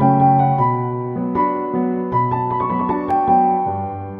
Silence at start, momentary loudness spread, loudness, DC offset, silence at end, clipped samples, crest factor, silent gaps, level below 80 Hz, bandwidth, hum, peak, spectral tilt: 0 s; 8 LU; -18 LUFS; under 0.1%; 0 s; under 0.1%; 14 dB; none; -50 dBFS; 4.9 kHz; none; -2 dBFS; -11.5 dB/octave